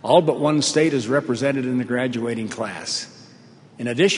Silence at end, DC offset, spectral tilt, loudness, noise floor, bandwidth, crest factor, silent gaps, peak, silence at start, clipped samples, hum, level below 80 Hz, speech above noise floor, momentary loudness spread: 0 s; under 0.1%; -4.5 dB/octave; -21 LUFS; -47 dBFS; 11 kHz; 20 dB; none; -2 dBFS; 0.05 s; under 0.1%; none; -66 dBFS; 27 dB; 10 LU